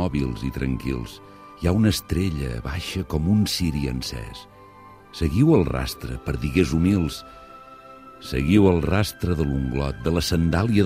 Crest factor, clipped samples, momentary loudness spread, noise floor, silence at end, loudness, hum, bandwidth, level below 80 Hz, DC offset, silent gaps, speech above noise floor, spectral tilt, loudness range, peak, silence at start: 18 dB; under 0.1%; 21 LU; -46 dBFS; 0 s; -23 LUFS; none; 15.5 kHz; -34 dBFS; under 0.1%; none; 24 dB; -6.5 dB/octave; 3 LU; -4 dBFS; 0 s